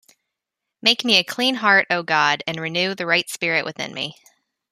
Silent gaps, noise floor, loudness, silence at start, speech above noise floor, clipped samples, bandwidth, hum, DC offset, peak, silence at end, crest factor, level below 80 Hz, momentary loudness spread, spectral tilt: none; -83 dBFS; -19 LUFS; 0.85 s; 63 dB; under 0.1%; 15.5 kHz; none; under 0.1%; -2 dBFS; 0.6 s; 20 dB; -70 dBFS; 11 LU; -2.5 dB/octave